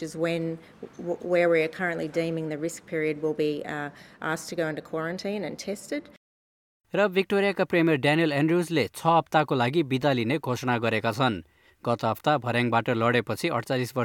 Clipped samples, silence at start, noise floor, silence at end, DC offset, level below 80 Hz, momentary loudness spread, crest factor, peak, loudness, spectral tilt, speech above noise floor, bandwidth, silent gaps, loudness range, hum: under 0.1%; 0 s; under -90 dBFS; 0 s; under 0.1%; -66 dBFS; 11 LU; 20 dB; -6 dBFS; -26 LUFS; -6 dB/octave; over 64 dB; 18.5 kHz; 6.17-6.80 s; 7 LU; none